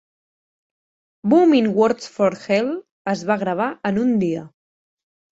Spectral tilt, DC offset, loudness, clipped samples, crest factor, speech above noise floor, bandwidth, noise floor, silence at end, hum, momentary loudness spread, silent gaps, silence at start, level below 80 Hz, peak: -6.5 dB/octave; under 0.1%; -19 LUFS; under 0.1%; 16 dB; over 72 dB; 8 kHz; under -90 dBFS; 0.85 s; none; 11 LU; 2.91-3.05 s; 1.25 s; -62 dBFS; -4 dBFS